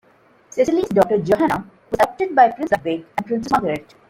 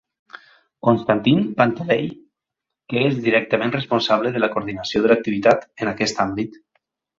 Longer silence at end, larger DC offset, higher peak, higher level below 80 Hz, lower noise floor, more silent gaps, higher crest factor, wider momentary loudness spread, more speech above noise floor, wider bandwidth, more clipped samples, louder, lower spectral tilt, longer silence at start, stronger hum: second, 0.3 s vs 0.7 s; neither; about the same, -2 dBFS vs -2 dBFS; about the same, -52 dBFS vs -56 dBFS; second, -54 dBFS vs -84 dBFS; neither; about the same, 18 dB vs 20 dB; about the same, 10 LU vs 8 LU; second, 36 dB vs 64 dB; first, 16.5 kHz vs 7.8 kHz; neither; about the same, -19 LUFS vs -20 LUFS; about the same, -6 dB/octave vs -6 dB/octave; first, 0.55 s vs 0.35 s; neither